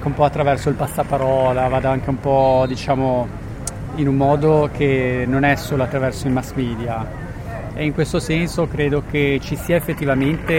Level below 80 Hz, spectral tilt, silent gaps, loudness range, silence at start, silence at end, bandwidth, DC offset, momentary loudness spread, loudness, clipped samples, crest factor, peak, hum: -34 dBFS; -6.5 dB/octave; none; 3 LU; 0 s; 0 s; 16.5 kHz; under 0.1%; 10 LU; -19 LUFS; under 0.1%; 16 dB; -2 dBFS; none